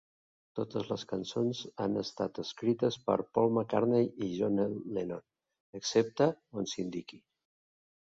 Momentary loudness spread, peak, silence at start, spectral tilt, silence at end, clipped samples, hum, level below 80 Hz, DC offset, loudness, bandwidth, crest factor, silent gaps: 11 LU; -12 dBFS; 0.55 s; -5.5 dB/octave; 0.95 s; under 0.1%; none; -70 dBFS; under 0.1%; -33 LUFS; 7.8 kHz; 20 dB; 5.60-5.73 s